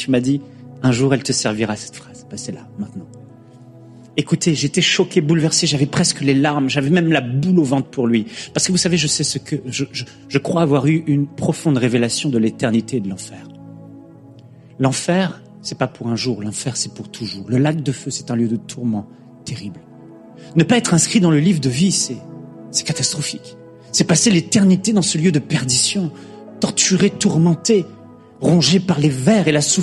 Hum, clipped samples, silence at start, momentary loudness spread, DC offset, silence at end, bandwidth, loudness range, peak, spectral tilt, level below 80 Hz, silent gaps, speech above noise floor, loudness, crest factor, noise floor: none; under 0.1%; 0 s; 16 LU; under 0.1%; 0 s; 12.5 kHz; 7 LU; 0 dBFS; -4.5 dB/octave; -54 dBFS; none; 25 dB; -17 LUFS; 18 dB; -42 dBFS